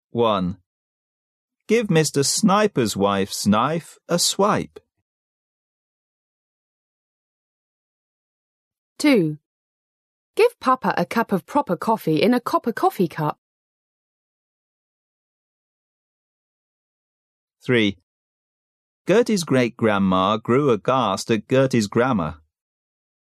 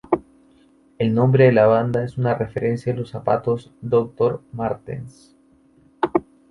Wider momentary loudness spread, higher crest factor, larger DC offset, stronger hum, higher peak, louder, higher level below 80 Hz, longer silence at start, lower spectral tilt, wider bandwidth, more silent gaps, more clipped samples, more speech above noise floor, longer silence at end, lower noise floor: second, 7 LU vs 12 LU; about the same, 18 dB vs 18 dB; neither; neither; second, -6 dBFS vs -2 dBFS; about the same, -20 LUFS vs -20 LUFS; second, -60 dBFS vs -54 dBFS; about the same, 0.15 s vs 0.1 s; second, -5 dB/octave vs -9 dB/octave; first, 14 kHz vs 10.5 kHz; first, 0.66-1.48 s, 5.02-8.71 s, 8.78-8.96 s, 9.46-10.34 s, 13.38-17.47 s, 18.03-19.05 s vs none; neither; first, over 70 dB vs 36 dB; first, 1 s vs 0.3 s; first, under -90 dBFS vs -55 dBFS